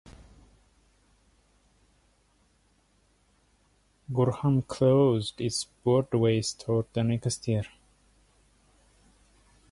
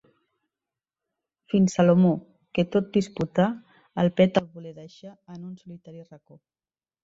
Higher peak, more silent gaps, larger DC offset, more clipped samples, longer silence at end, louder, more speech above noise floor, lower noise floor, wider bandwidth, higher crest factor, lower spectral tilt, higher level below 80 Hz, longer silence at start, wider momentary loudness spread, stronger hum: second, -12 dBFS vs -6 dBFS; neither; neither; neither; first, 2.05 s vs 1 s; second, -27 LUFS vs -23 LUFS; second, 41 dB vs over 66 dB; second, -67 dBFS vs under -90 dBFS; first, 11.5 kHz vs 7.8 kHz; about the same, 18 dB vs 20 dB; about the same, -6.5 dB/octave vs -7.5 dB/octave; about the same, -58 dBFS vs -62 dBFS; first, 4.1 s vs 1.55 s; second, 8 LU vs 24 LU; first, 50 Hz at -60 dBFS vs none